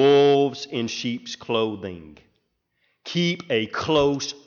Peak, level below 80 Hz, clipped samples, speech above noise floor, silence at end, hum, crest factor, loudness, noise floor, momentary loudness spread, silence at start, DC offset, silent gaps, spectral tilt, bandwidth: -6 dBFS; -58 dBFS; under 0.1%; 47 dB; 0.1 s; none; 16 dB; -23 LUFS; -72 dBFS; 16 LU; 0 s; under 0.1%; none; -5 dB/octave; 7.2 kHz